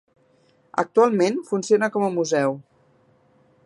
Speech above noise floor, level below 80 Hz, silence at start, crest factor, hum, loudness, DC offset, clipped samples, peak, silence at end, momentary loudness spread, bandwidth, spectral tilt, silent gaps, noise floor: 40 dB; -74 dBFS; 0.75 s; 18 dB; none; -21 LUFS; under 0.1%; under 0.1%; -4 dBFS; 1.05 s; 8 LU; 11.5 kHz; -5.5 dB/octave; none; -60 dBFS